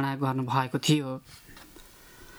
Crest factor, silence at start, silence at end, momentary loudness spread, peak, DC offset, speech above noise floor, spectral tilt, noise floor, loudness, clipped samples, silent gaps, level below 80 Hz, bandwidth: 20 dB; 0 s; 0 s; 23 LU; -10 dBFS; under 0.1%; 23 dB; -5 dB/octave; -51 dBFS; -28 LUFS; under 0.1%; none; -60 dBFS; over 20 kHz